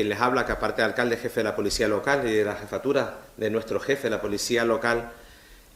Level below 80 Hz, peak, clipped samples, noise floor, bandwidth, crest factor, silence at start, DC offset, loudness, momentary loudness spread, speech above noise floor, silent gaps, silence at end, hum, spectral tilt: -48 dBFS; -6 dBFS; under 0.1%; -50 dBFS; 16 kHz; 20 dB; 0 s; under 0.1%; -25 LUFS; 5 LU; 25 dB; none; 0.2 s; none; -4 dB/octave